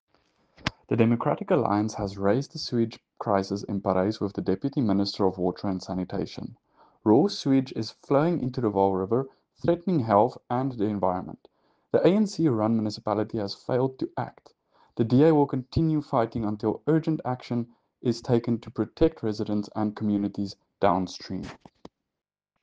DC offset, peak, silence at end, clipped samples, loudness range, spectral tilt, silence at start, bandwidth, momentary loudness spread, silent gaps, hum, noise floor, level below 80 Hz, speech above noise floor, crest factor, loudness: under 0.1%; -6 dBFS; 1.05 s; under 0.1%; 3 LU; -7.5 dB/octave; 0.65 s; 8.8 kHz; 11 LU; none; none; -68 dBFS; -54 dBFS; 42 dB; 20 dB; -26 LUFS